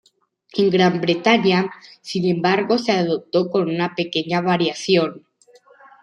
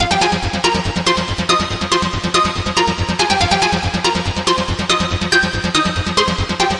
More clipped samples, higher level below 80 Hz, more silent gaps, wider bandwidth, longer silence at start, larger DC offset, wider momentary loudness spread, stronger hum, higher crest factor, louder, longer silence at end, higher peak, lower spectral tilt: neither; second, -64 dBFS vs -34 dBFS; neither; about the same, 10.5 kHz vs 11.5 kHz; first, 0.55 s vs 0 s; neither; first, 8 LU vs 3 LU; neither; about the same, 18 dB vs 16 dB; second, -19 LUFS vs -16 LUFS; first, 0.85 s vs 0 s; about the same, -2 dBFS vs 0 dBFS; first, -5.5 dB/octave vs -3.5 dB/octave